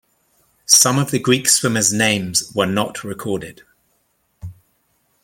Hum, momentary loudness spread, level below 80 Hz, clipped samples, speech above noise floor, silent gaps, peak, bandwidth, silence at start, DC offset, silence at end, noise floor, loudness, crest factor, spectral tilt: none; 25 LU; -54 dBFS; under 0.1%; 48 dB; none; 0 dBFS; 16.5 kHz; 0.7 s; under 0.1%; 0.7 s; -65 dBFS; -16 LUFS; 20 dB; -2.5 dB/octave